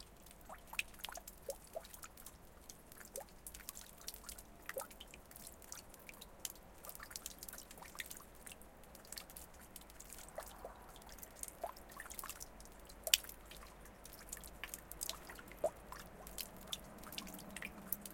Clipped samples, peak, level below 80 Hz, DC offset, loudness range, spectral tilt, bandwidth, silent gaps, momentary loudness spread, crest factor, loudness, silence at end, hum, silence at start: under 0.1%; -6 dBFS; -62 dBFS; under 0.1%; 9 LU; -1 dB/octave; 17 kHz; none; 12 LU; 42 dB; -47 LUFS; 0 s; none; 0 s